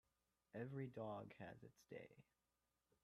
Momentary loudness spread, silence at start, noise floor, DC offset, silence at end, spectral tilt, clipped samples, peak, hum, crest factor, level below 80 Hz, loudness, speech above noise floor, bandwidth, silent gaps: 10 LU; 0.55 s; under -90 dBFS; under 0.1%; 0.8 s; -8 dB/octave; under 0.1%; -38 dBFS; none; 18 dB; -86 dBFS; -55 LUFS; over 36 dB; 12 kHz; none